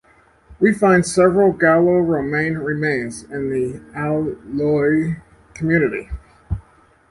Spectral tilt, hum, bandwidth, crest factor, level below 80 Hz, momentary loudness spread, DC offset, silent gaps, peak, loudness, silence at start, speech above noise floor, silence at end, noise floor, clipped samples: -6.5 dB/octave; none; 11.5 kHz; 16 dB; -40 dBFS; 16 LU; under 0.1%; none; -2 dBFS; -18 LUFS; 0.5 s; 35 dB; 0.5 s; -52 dBFS; under 0.1%